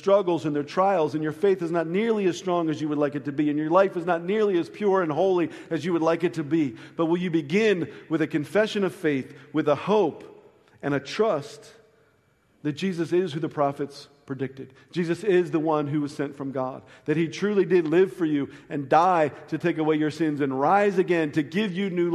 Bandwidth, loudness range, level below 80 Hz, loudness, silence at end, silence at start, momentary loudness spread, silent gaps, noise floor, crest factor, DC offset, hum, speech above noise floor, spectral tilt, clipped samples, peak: 12.5 kHz; 5 LU; -72 dBFS; -25 LUFS; 0 s; 0 s; 9 LU; none; -64 dBFS; 20 dB; under 0.1%; none; 40 dB; -7 dB/octave; under 0.1%; -4 dBFS